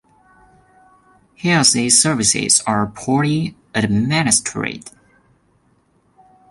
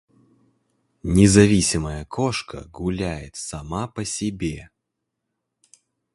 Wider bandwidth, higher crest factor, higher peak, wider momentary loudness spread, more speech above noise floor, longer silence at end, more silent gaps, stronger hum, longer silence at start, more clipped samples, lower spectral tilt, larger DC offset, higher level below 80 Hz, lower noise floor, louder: about the same, 12 kHz vs 11.5 kHz; about the same, 20 dB vs 22 dB; about the same, 0 dBFS vs 0 dBFS; second, 12 LU vs 17 LU; second, 42 dB vs 59 dB; about the same, 1.6 s vs 1.5 s; neither; neither; first, 1.45 s vs 1.05 s; neither; second, -3 dB/octave vs -5 dB/octave; neither; second, -50 dBFS vs -40 dBFS; second, -59 dBFS vs -80 dBFS; first, -16 LUFS vs -21 LUFS